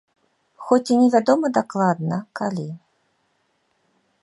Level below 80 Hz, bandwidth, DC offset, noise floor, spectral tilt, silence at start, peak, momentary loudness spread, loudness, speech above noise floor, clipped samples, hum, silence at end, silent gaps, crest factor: -72 dBFS; 11 kHz; under 0.1%; -68 dBFS; -6.5 dB/octave; 0.6 s; -2 dBFS; 17 LU; -20 LUFS; 49 dB; under 0.1%; none; 1.45 s; none; 20 dB